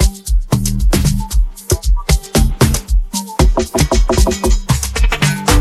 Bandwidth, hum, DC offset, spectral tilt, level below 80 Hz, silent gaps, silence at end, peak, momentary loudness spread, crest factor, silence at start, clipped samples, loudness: 14.5 kHz; none; under 0.1%; -4.5 dB/octave; -16 dBFS; none; 0 s; 0 dBFS; 5 LU; 12 dB; 0 s; under 0.1%; -15 LUFS